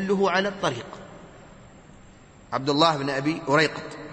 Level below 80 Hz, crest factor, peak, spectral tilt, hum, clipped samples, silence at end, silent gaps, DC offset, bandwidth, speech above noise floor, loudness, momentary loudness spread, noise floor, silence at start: -58 dBFS; 22 dB; -4 dBFS; -5 dB/octave; none; under 0.1%; 0 s; none; under 0.1%; 8.8 kHz; 26 dB; -23 LUFS; 17 LU; -49 dBFS; 0 s